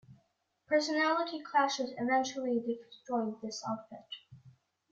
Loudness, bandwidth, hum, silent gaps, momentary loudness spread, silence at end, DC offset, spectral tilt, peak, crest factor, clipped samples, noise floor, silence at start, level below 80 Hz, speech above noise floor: -33 LUFS; 7.8 kHz; none; none; 14 LU; 0.4 s; under 0.1%; -3.5 dB/octave; -16 dBFS; 18 dB; under 0.1%; -76 dBFS; 0.1 s; -80 dBFS; 43 dB